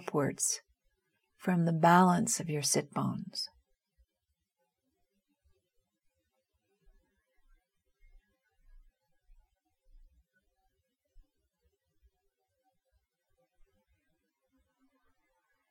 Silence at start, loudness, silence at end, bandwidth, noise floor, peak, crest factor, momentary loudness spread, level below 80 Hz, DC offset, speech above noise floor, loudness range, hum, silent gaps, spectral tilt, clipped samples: 0 s; -30 LUFS; 12.25 s; 17.5 kHz; -85 dBFS; -10 dBFS; 26 dB; 15 LU; -68 dBFS; under 0.1%; 56 dB; 16 LU; none; none; -4.5 dB/octave; under 0.1%